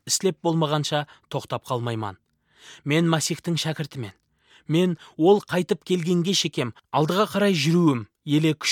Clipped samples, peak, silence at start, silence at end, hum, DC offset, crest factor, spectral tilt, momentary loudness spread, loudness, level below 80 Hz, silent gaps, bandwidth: under 0.1%; -6 dBFS; 0.05 s; 0 s; none; under 0.1%; 18 dB; -5 dB/octave; 12 LU; -23 LUFS; -68 dBFS; none; 16.5 kHz